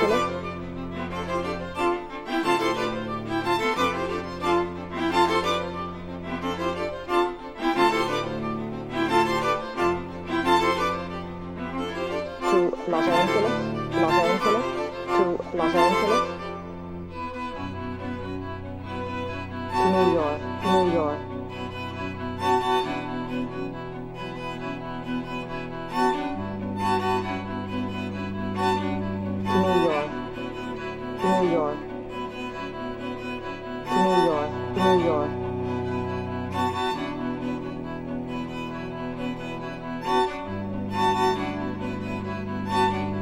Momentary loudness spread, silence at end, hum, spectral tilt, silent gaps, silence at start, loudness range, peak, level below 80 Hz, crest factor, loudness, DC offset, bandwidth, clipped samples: 12 LU; 0 s; none; -6 dB/octave; none; 0 s; 6 LU; -6 dBFS; -48 dBFS; 20 dB; -26 LUFS; under 0.1%; 16 kHz; under 0.1%